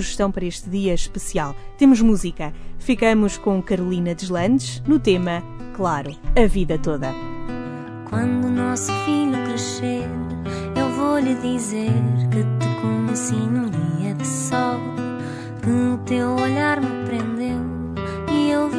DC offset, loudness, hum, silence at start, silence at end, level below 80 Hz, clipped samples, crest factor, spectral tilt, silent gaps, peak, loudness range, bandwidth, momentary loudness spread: under 0.1%; -21 LUFS; none; 0 s; 0 s; -32 dBFS; under 0.1%; 20 dB; -6 dB/octave; none; -2 dBFS; 3 LU; 11 kHz; 10 LU